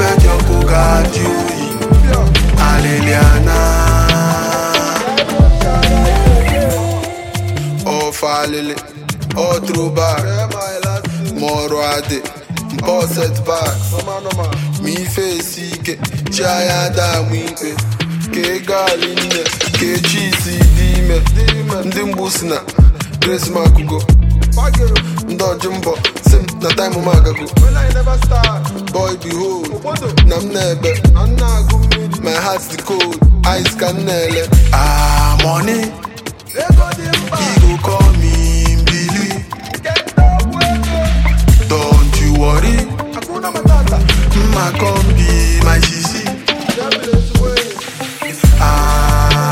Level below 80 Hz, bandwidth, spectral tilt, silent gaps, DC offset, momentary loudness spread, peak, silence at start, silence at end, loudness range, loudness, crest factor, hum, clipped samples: -14 dBFS; 16.5 kHz; -5 dB/octave; none; under 0.1%; 9 LU; 0 dBFS; 0 s; 0 s; 5 LU; -13 LUFS; 12 dB; none; under 0.1%